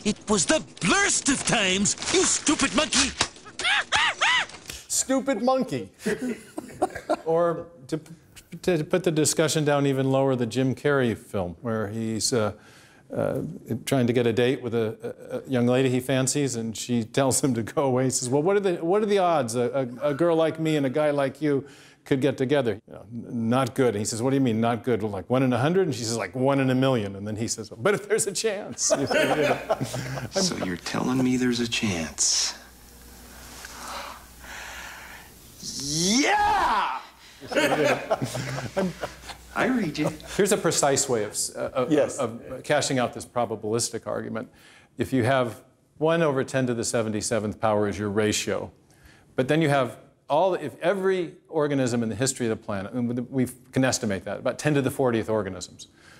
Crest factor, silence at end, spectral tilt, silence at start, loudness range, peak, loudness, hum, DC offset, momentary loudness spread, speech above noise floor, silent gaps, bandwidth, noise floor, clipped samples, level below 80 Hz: 22 dB; 0.35 s; -4 dB/octave; 0 s; 4 LU; -4 dBFS; -25 LUFS; none; under 0.1%; 13 LU; 30 dB; none; 16 kHz; -54 dBFS; under 0.1%; -56 dBFS